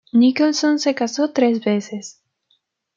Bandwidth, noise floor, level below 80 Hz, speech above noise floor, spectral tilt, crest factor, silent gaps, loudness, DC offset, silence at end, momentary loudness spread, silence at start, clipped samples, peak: 7.6 kHz; -66 dBFS; -72 dBFS; 48 dB; -4.5 dB/octave; 14 dB; none; -18 LUFS; under 0.1%; 0.85 s; 16 LU; 0.15 s; under 0.1%; -4 dBFS